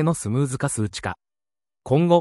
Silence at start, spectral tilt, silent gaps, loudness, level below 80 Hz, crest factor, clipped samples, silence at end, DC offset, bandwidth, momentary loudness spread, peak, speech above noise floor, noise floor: 0 s; -6 dB/octave; none; -24 LUFS; -54 dBFS; 18 dB; under 0.1%; 0 s; under 0.1%; 12 kHz; 11 LU; -4 dBFS; over 69 dB; under -90 dBFS